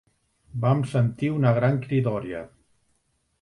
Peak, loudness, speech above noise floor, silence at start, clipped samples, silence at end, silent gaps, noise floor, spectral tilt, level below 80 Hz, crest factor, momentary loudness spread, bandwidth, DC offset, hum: -8 dBFS; -24 LUFS; 48 dB; 0.55 s; under 0.1%; 0.95 s; none; -71 dBFS; -9 dB/octave; -58 dBFS; 18 dB; 14 LU; 11 kHz; under 0.1%; none